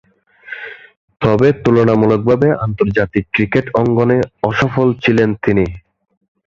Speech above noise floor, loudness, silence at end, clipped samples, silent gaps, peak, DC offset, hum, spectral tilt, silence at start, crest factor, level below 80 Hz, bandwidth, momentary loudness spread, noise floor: 22 dB; -14 LUFS; 0.65 s; under 0.1%; 0.97-1.08 s; -2 dBFS; under 0.1%; none; -8 dB/octave; 0.45 s; 14 dB; -40 dBFS; 7.4 kHz; 9 LU; -35 dBFS